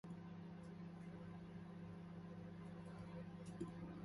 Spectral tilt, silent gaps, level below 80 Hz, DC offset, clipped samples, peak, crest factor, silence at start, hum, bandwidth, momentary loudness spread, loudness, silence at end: -8 dB/octave; none; -72 dBFS; under 0.1%; under 0.1%; -36 dBFS; 16 dB; 0.05 s; 50 Hz at -60 dBFS; 11.5 kHz; 3 LU; -55 LUFS; 0 s